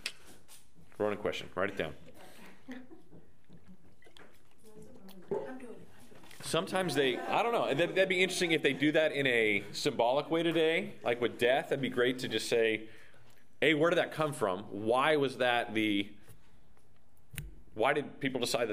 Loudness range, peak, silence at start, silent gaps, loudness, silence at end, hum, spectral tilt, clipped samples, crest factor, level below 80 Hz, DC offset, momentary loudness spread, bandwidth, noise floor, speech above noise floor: 14 LU; -12 dBFS; 0.05 s; none; -31 LUFS; 0 s; none; -4 dB/octave; under 0.1%; 22 dB; -66 dBFS; 0.4%; 15 LU; 15.5 kHz; -67 dBFS; 36 dB